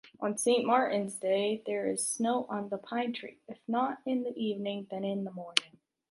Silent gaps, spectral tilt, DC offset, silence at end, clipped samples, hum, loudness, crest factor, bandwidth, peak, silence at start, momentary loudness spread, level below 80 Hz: none; -3.5 dB/octave; under 0.1%; 0.45 s; under 0.1%; none; -32 LUFS; 30 dB; 12 kHz; -2 dBFS; 0.05 s; 9 LU; -82 dBFS